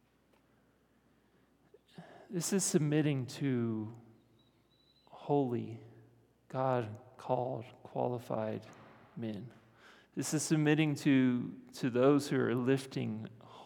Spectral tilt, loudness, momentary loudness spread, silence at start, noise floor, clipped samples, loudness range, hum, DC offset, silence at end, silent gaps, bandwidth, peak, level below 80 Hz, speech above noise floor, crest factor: -5.5 dB/octave; -34 LUFS; 18 LU; 2 s; -70 dBFS; under 0.1%; 8 LU; none; under 0.1%; 0 s; none; 19 kHz; -16 dBFS; -82 dBFS; 37 dB; 20 dB